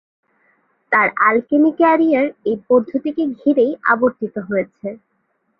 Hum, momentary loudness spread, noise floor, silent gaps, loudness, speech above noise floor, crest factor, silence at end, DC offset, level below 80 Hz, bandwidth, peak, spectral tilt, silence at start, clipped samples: none; 10 LU; -67 dBFS; none; -16 LUFS; 51 dB; 16 dB; 0.65 s; under 0.1%; -62 dBFS; 5.2 kHz; -2 dBFS; -9.5 dB/octave; 0.9 s; under 0.1%